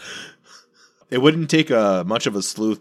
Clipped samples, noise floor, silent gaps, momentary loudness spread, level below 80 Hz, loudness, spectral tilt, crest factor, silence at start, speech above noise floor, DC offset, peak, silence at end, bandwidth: under 0.1%; -56 dBFS; none; 18 LU; -72 dBFS; -19 LUFS; -4.5 dB/octave; 20 dB; 0 s; 38 dB; under 0.1%; 0 dBFS; 0.05 s; 14 kHz